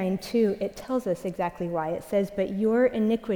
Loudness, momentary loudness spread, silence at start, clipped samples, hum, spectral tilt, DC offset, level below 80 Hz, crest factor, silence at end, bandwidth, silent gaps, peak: -27 LUFS; 7 LU; 0 s; under 0.1%; none; -7 dB/octave; under 0.1%; -56 dBFS; 14 dB; 0 s; 20 kHz; none; -12 dBFS